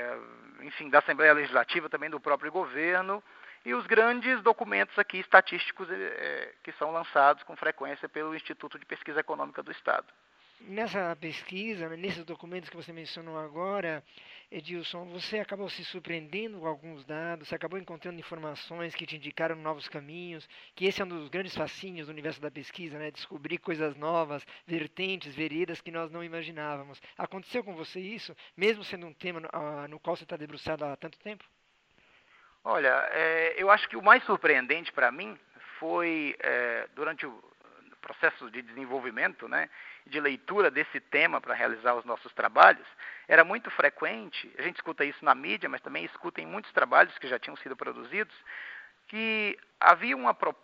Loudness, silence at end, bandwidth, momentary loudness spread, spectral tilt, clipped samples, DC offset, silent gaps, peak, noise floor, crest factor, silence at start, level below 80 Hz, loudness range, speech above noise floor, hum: -29 LUFS; 0.1 s; 9 kHz; 19 LU; -5.5 dB/octave; under 0.1%; under 0.1%; none; -2 dBFS; -68 dBFS; 28 dB; 0 s; -78 dBFS; 13 LU; 38 dB; none